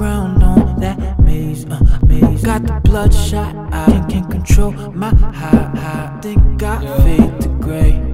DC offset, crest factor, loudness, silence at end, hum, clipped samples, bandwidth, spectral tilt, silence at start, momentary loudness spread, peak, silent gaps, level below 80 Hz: 1%; 12 dB; -15 LUFS; 0 s; none; 0.2%; 15.5 kHz; -7.5 dB/octave; 0 s; 9 LU; 0 dBFS; none; -14 dBFS